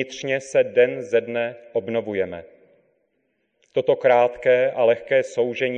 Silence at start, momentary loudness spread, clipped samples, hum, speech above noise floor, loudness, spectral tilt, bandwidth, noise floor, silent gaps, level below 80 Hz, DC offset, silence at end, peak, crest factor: 0 s; 9 LU; under 0.1%; none; 50 dB; -21 LUFS; -5 dB/octave; 9.4 kHz; -71 dBFS; none; -64 dBFS; under 0.1%; 0 s; -6 dBFS; 16 dB